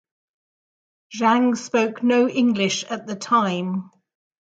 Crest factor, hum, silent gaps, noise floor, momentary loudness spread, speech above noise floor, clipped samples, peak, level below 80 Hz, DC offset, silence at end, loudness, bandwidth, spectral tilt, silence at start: 16 dB; none; none; under -90 dBFS; 11 LU; over 70 dB; under 0.1%; -6 dBFS; -72 dBFS; under 0.1%; 0.75 s; -21 LUFS; 8.6 kHz; -4.5 dB/octave; 1.1 s